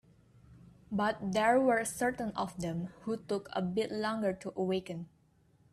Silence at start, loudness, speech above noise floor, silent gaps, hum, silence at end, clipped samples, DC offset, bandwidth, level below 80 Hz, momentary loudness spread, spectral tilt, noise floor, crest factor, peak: 0.5 s; -33 LUFS; 34 dB; none; none; 0.65 s; under 0.1%; under 0.1%; 14.5 kHz; -64 dBFS; 12 LU; -5 dB/octave; -67 dBFS; 18 dB; -16 dBFS